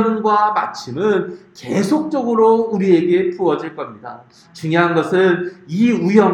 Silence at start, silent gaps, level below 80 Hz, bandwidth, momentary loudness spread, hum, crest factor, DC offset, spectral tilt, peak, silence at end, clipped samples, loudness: 0 s; none; -62 dBFS; 12 kHz; 15 LU; none; 16 dB; under 0.1%; -7 dB/octave; 0 dBFS; 0 s; under 0.1%; -16 LUFS